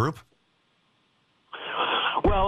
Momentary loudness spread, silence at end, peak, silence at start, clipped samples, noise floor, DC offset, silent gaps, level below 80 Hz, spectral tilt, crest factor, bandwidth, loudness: 21 LU; 0 s; -10 dBFS; 0 s; under 0.1%; -68 dBFS; under 0.1%; none; -38 dBFS; -6 dB/octave; 16 dB; 11.5 kHz; -26 LUFS